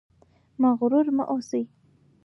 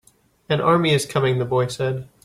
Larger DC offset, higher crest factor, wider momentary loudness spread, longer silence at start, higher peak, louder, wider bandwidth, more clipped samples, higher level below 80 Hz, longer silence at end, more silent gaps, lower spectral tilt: neither; about the same, 14 dB vs 16 dB; about the same, 9 LU vs 8 LU; about the same, 0.6 s vs 0.5 s; second, -10 dBFS vs -4 dBFS; second, -24 LUFS vs -20 LUFS; second, 7 kHz vs 14.5 kHz; neither; second, -72 dBFS vs -54 dBFS; first, 0.6 s vs 0.2 s; neither; first, -7 dB/octave vs -5.5 dB/octave